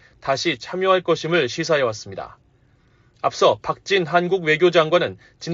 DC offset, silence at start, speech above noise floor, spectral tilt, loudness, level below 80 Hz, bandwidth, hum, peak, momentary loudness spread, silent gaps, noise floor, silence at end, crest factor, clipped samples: under 0.1%; 0.25 s; 37 dB; -3 dB/octave; -20 LUFS; -60 dBFS; 7.6 kHz; none; -4 dBFS; 13 LU; none; -57 dBFS; 0 s; 18 dB; under 0.1%